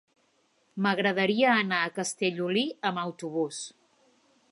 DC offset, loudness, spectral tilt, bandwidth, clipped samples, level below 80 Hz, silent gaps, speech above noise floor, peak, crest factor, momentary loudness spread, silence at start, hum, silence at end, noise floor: under 0.1%; -27 LUFS; -4 dB/octave; 11.5 kHz; under 0.1%; -80 dBFS; none; 42 dB; -10 dBFS; 20 dB; 11 LU; 0.75 s; none; 0.8 s; -69 dBFS